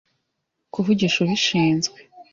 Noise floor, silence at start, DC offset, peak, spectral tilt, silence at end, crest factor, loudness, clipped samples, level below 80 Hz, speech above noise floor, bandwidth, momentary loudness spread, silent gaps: -77 dBFS; 0.75 s; under 0.1%; -8 dBFS; -4.5 dB/octave; 0.1 s; 14 dB; -20 LUFS; under 0.1%; -58 dBFS; 57 dB; 7.6 kHz; 9 LU; none